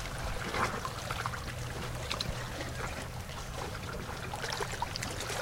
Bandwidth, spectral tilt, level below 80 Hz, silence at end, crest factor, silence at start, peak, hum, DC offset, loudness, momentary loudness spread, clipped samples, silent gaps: 17 kHz; -3.5 dB/octave; -46 dBFS; 0 s; 22 dB; 0 s; -14 dBFS; none; under 0.1%; -37 LUFS; 6 LU; under 0.1%; none